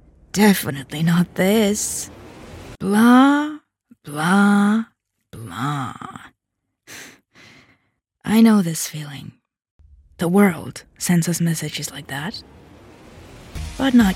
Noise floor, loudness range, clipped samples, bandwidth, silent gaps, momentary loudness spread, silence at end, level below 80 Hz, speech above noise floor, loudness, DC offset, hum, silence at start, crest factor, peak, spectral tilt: -78 dBFS; 7 LU; under 0.1%; 16.5 kHz; 9.71-9.79 s; 23 LU; 0 s; -48 dBFS; 60 dB; -18 LUFS; under 0.1%; none; 0.35 s; 18 dB; -2 dBFS; -5 dB/octave